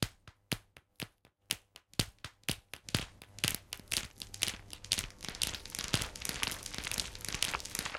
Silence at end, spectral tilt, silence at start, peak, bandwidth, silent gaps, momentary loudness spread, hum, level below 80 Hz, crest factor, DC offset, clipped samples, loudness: 0 s; -2 dB/octave; 0 s; -8 dBFS; 17 kHz; none; 9 LU; none; -54 dBFS; 32 dB; under 0.1%; under 0.1%; -37 LUFS